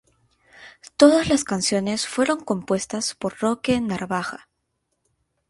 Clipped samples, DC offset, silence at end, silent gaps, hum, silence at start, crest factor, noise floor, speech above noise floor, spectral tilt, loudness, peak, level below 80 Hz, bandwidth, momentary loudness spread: under 0.1%; under 0.1%; 1.15 s; none; none; 0.6 s; 22 dB; -75 dBFS; 53 dB; -4 dB/octave; -22 LUFS; 0 dBFS; -54 dBFS; 11.5 kHz; 11 LU